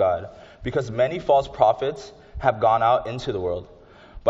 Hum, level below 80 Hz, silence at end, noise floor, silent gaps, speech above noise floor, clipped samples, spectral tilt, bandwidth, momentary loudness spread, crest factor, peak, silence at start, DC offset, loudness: none; -46 dBFS; 0 s; -44 dBFS; none; 22 dB; under 0.1%; -4.5 dB/octave; 7.8 kHz; 15 LU; 20 dB; -2 dBFS; 0 s; under 0.1%; -23 LUFS